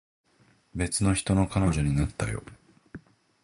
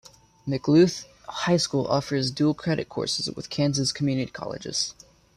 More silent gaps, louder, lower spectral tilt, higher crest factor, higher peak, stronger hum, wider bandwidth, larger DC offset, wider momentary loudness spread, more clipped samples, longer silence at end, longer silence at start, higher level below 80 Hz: neither; about the same, -27 LUFS vs -25 LUFS; about the same, -5.5 dB/octave vs -5 dB/octave; about the same, 18 dB vs 16 dB; second, -12 dBFS vs -8 dBFS; neither; second, 11.5 kHz vs 13.5 kHz; neither; first, 24 LU vs 11 LU; neither; about the same, 0.45 s vs 0.45 s; first, 0.75 s vs 0.45 s; first, -40 dBFS vs -58 dBFS